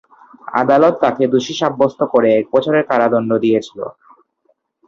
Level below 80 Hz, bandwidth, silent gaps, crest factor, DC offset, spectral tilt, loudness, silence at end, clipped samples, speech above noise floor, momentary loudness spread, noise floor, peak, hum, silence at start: -60 dBFS; 7.4 kHz; none; 14 dB; under 0.1%; -6 dB/octave; -15 LUFS; 0.95 s; under 0.1%; 48 dB; 8 LU; -63 dBFS; -2 dBFS; none; 0.45 s